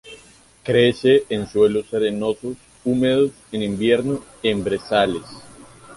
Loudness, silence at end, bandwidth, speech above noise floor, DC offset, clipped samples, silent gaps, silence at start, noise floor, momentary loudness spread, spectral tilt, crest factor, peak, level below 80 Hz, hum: -20 LUFS; 0 s; 11.5 kHz; 30 dB; under 0.1%; under 0.1%; none; 0.05 s; -49 dBFS; 11 LU; -6 dB/octave; 16 dB; -4 dBFS; -52 dBFS; none